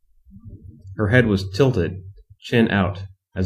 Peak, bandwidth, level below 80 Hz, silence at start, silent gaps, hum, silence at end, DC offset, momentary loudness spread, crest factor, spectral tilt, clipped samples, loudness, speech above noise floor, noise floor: 0 dBFS; 11.5 kHz; -46 dBFS; 0.35 s; none; none; 0 s; under 0.1%; 20 LU; 20 dB; -7.5 dB/octave; under 0.1%; -20 LUFS; 26 dB; -45 dBFS